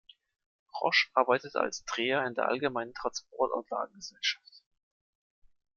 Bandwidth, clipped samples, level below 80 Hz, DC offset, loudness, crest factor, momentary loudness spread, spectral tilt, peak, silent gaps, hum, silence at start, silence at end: 7.4 kHz; under 0.1%; -72 dBFS; under 0.1%; -31 LUFS; 24 dB; 10 LU; -2.5 dB/octave; -10 dBFS; none; none; 0.75 s; 1.2 s